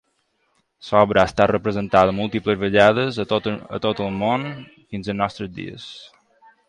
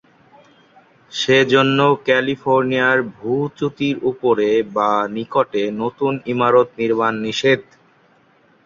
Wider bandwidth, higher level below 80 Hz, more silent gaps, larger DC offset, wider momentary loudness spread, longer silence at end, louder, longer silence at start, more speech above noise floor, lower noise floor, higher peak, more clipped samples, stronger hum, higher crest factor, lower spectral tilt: first, 10.5 kHz vs 7.6 kHz; first, -48 dBFS vs -60 dBFS; neither; neither; first, 18 LU vs 7 LU; second, 0.6 s vs 1.05 s; second, -20 LUFS vs -17 LUFS; second, 0.85 s vs 1.1 s; first, 48 dB vs 38 dB; first, -68 dBFS vs -55 dBFS; about the same, 0 dBFS vs 0 dBFS; neither; neither; about the same, 20 dB vs 18 dB; about the same, -6.5 dB/octave vs -5.5 dB/octave